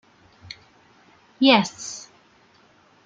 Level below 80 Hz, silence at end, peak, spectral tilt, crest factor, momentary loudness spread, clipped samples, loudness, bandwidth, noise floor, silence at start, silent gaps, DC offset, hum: -70 dBFS; 1.05 s; -2 dBFS; -3.5 dB/octave; 24 dB; 25 LU; under 0.1%; -20 LUFS; 9.2 kHz; -57 dBFS; 1.4 s; none; under 0.1%; none